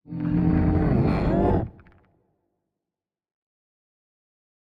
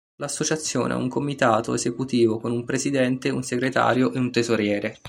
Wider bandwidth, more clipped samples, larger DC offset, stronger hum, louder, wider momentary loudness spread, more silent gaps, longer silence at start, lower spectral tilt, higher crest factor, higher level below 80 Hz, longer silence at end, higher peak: second, 5.4 kHz vs 15.5 kHz; neither; neither; neither; about the same, -23 LUFS vs -23 LUFS; about the same, 5 LU vs 5 LU; neither; about the same, 0.1 s vs 0.2 s; first, -11 dB/octave vs -4.5 dB/octave; about the same, 16 dB vs 18 dB; first, -36 dBFS vs -60 dBFS; first, 2.95 s vs 0 s; second, -10 dBFS vs -4 dBFS